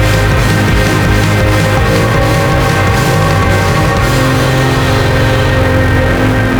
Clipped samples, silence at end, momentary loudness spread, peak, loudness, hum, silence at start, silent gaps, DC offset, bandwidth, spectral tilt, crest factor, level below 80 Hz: under 0.1%; 0 s; 0 LU; 0 dBFS; -10 LUFS; none; 0 s; none; under 0.1%; over 20 kHz; -5.5 dB/octave; 10 dB; -18 dBFS